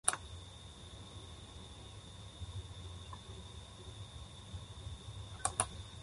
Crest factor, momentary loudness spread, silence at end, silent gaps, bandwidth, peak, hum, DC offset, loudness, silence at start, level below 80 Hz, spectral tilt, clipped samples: 36 dB; 14 LU; 0 s; none; 11.5 kHz; -10 dBFS; none; under 0.1%; -45 LUFS; 0.05 s; -54 dBFS; -2.5 dB/octave; under 0.1%